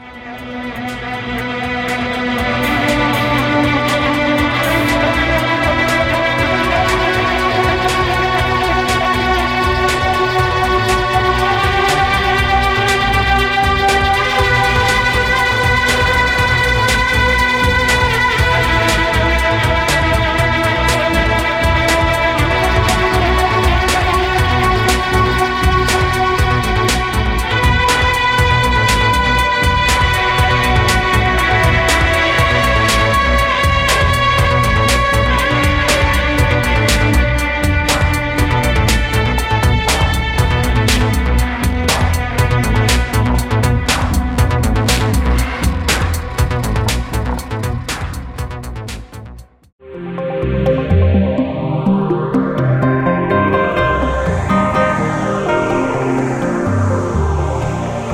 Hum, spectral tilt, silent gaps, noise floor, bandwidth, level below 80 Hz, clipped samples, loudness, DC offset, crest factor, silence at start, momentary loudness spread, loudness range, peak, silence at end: none; -4.5 dB/octave; 49.72-49.79 s; -35 dBFS; 16.5 kHz; -22 dBFS; under 0.1%; -14 LUFS; under 0.1%; 14 dB; 0 s; 6 LU; 4 LU; 0 dBFS; 0 s